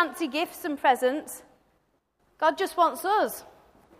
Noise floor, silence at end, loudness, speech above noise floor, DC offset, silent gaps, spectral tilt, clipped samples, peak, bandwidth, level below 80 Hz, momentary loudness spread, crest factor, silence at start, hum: -70 dBFS; 0.5 s; -26 LUFS; 44 dB; under 0.1%; none; -2 dB/octave; under 0.1%; -8 dBFS; 15.5 kHz; -70 dBFS; 14 LU; 20 dB; 0 s; none